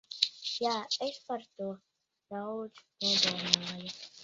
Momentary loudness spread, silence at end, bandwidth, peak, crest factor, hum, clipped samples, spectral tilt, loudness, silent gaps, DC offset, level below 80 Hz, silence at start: 16 LU; 0 s; 7.6 kHz; -2 dBFS; 34 dB; none; under 0.1%; -1 dB/octave; -32 LUFS; none; under 0.1%; -76 dBFS; 0.1 s